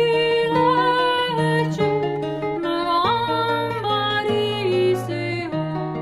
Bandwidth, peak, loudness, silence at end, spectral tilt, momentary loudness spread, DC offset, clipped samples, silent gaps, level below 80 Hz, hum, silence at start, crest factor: 13 kHz; -6 dBFS; -21 LUFS; 0 s; -6 dB/octave; 7 LU; under 0.1%; under 0.1%; none; -54 dBFS; none; 0 s; 14 dB